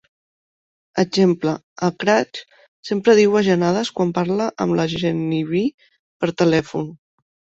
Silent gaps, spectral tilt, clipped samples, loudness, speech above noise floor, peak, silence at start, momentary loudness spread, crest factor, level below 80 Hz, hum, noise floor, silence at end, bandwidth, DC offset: 1.63-1.76 s, 2.68-2.83 s, 5.74-5.78 s, 5.99-6.20 s; -6 dB/octave; under 0.1%; -19 LUFS; over 72 dB; -2 dBFS; 0.95 s; 12 LU; 18 dB; -56 dBFS; none; under -90 dBFS; 0.65 s; 8 kHz; under 0.1%